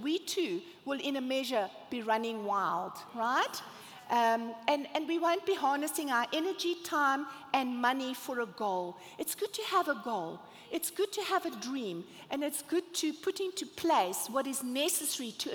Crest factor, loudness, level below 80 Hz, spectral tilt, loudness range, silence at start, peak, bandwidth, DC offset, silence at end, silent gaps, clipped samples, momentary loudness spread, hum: 20 dB; -33 LUFS; -82 dBFS; -2 dB/octave; 3 LU; 0 s; -12 dBFS; over 20 kHz; under 0.1%; 0 s; none; under 0.1%; 8 LU; none